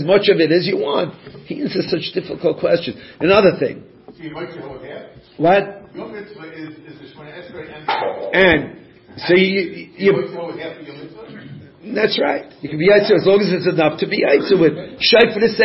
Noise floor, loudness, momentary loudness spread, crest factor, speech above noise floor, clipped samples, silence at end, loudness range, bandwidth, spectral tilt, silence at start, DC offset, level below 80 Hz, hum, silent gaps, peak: -37 dBFS; -16 LUFS; 22 LU; 18 dB; 20 dB; under 0.1%; 0 s; 8 LU; 5.8 kHz; -8.5 dB/octave; 0 s; under 0.1%; -50 dBFS; none; none; 0 dBFS